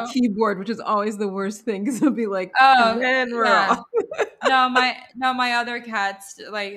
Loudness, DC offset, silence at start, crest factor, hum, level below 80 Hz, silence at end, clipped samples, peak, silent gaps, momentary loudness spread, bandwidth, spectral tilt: -20 LUFS; under 0.1%; 0 s; 18 dB; none; -68 dBFS; 0 s; under 0.1%; -2 dBFS; none; 10 LU; 14 kHz; -4 dB/octave